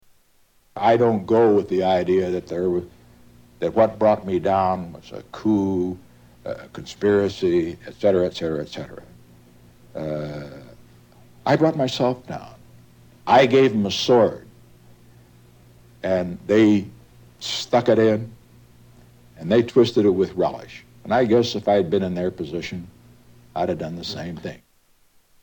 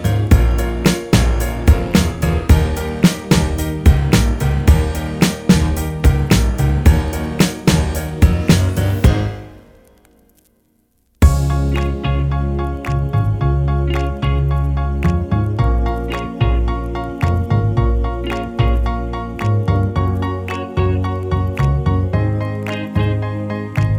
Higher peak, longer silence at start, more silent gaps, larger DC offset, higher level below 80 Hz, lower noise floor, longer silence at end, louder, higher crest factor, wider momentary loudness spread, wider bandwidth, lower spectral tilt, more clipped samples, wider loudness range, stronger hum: about the same, -2 dBFS vs 0 dBFS; first, 0.75 s vs 0 s; neither; neither; second, -56 dBFS vs -20 dBFS; about the same, -59 dBFS vs -60 dBFS; first, 0.85 s vs 0 s; second, -21 LUFS vs -17 LUFS; about the same, 20 dB vs 16 dB; first, 19 LU vs 7 LU; about the same, 18 kHz vs 19.5 kHz; about the same, -6.5 dB/octave vs -6.5 dB/octave; neither; about the same, 6 LU vs 4 LU; first, 60 Hz at -50 dBFS vs none